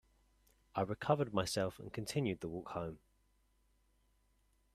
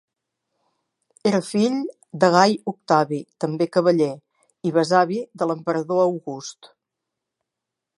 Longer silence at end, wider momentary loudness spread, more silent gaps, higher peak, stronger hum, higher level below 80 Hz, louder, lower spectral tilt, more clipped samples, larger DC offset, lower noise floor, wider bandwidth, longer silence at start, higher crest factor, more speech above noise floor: first, 1.75 s vs 1.3 s; about the same, 10 LU vs 12 LU; neither; second, -16 dBFS vs -2 dBFS; neither; about the same, -68 dBFS vs -72 dBFS; second, -39 LUFS vs -21 LUFS; about the same, -5.5 dB/octave vs -5.5 dB/octave; neither; neither; second, -75 dBFS vs -84 dBFS; first, 14.5 kHz vs 11.5 kHz; second, 0.75 s vs 1.25 s; about the same, 24 dB vs 22 dB; second, 37 dB vs 64 dB